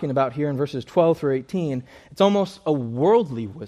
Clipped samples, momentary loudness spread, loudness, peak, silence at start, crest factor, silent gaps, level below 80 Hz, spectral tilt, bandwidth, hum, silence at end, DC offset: under 0.1%; 8 LU; -22 LUFS; -4 dBFS; 0 s; 18 dB; none; -60 dBFS; -7.5 dB/octave; 13 kHz; none; 0 s; under 0.1%